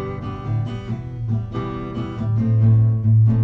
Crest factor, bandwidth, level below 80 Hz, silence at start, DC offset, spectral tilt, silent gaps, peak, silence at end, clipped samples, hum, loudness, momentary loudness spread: 12 dB; 3.9 kHz; -40 dBFS; 0 s; under 0.1%; -10.5 dB/octave; none; -6 dBFS; 0 s; under 0.1%; none; -21 LUFS; 13 LU